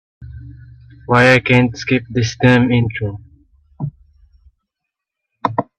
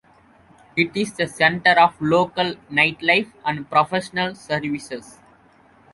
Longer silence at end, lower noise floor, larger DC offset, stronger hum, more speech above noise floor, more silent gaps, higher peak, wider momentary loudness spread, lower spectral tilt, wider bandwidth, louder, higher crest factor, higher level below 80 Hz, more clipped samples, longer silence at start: second, 0.15 s vs 0.85 s; first, -80 dBFS vs -54 dBFS; neither; neither; first, 67 dB vs 33 dB; neither; about the same, 0 dBFS vs -2 dBFS; first, 25 LU vs 12 LU; first, -6.5 dB/octave vs -4.5 dB/octave; second, 9.4 kHz vs 11.5 kHz; first, -15 LUFS vs -20 LUFS; about the same, 18 dB vs 20 dB; first, -44 dBFS vs -58 dBFS; neither; second, 0.2 s vs 0.75 s